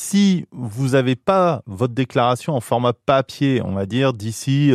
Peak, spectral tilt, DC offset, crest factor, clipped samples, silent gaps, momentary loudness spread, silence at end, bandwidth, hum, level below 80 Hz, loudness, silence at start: -4 dBFS; -6 dB/octave; under 0.1%; 14 dB; under 0.1%; none; 6 LU; 0 s; 14.5 kHz; none; -58 dBFS; -19 LUFS; 0 s